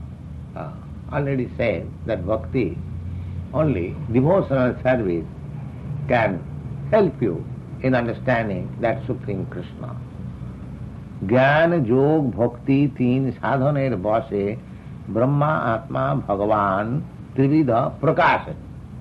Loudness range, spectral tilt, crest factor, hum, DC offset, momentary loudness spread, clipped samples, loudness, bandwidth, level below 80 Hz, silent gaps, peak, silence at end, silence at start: 5 LU; -9.5 dB/octave; 16 dB; none; under 0.1%; 16 LU; under 0.1%; -21 LUFS; 6 kHz; -44 dBFS; none; -6 dBFS; 0 s; 0 s